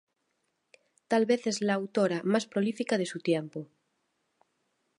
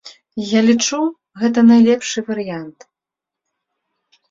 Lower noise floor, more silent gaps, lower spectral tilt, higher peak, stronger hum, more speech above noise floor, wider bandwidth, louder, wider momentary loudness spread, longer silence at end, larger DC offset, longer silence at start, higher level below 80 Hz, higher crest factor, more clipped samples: second, -78 dBFS vs -85 dBFS; neither; about the same, -5 dB/octave vs -4 dB/octave; second, -14 dBFS vs -2 dBFS; neither; second, 50 dB vs 71 dB; first, 11.5 kHz vs 7.6 kHz; second, -29 LUFS vs -15 LUFS; second, 5 LU vs 18 LU; second, 1.35 s vs 1.6 s; neither; first, 1.1 s vs 0.05 s; second, -82 dBFS vs -62 dBFS; about the same, 18 dB vs 16 dB; neither